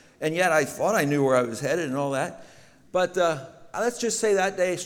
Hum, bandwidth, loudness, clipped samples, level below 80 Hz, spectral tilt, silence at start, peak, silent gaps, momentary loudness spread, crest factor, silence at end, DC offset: none; 18.5 kHz; -25 LUFS; under 0.1%; -64 dBFS; -4 dB/octave; 0.2 s; -8 dBFS; none; 8 LU; 16 dB; 0 s; under 0.1%